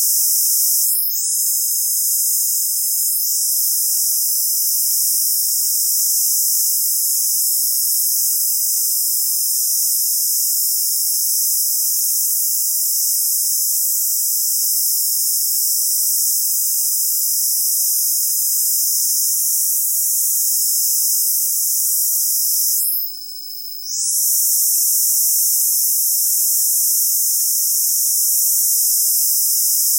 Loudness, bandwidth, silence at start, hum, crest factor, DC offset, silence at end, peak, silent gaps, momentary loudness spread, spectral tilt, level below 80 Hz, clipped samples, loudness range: -14 LUFS; 16.5 kHz; 0 s; none; 12 dB; under 0.1%; 0 s; -4 dBFS; none; 2 LU; 13.5 dB/octave; under -90 dBFS; under 0.1%; 2 LU